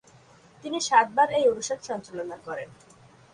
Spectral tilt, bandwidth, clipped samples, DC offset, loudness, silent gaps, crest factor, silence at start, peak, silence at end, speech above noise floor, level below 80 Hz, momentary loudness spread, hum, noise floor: -2.5 dB/octave; 11 kHz; under 0.1%; under 0.1%; -25 LUFS; none; 20 dB; 0.65 s; -6 dBFS; 0.7 s; 29 dB; -68 dBFS; 16 LU; none; -55 dBFS